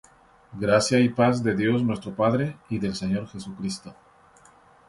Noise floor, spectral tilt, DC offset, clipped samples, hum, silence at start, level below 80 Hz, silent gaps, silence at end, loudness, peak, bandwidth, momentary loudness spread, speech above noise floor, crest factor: -55 dBFS; -6 dB/octave; under 0.1%; under 0.1%; none; 0.5 s; -56 dBFS; none; 0.95 s; -24 LUFS; -6 dBFS; 11.5 kHz; 13 LU; 31 dB; 20 dB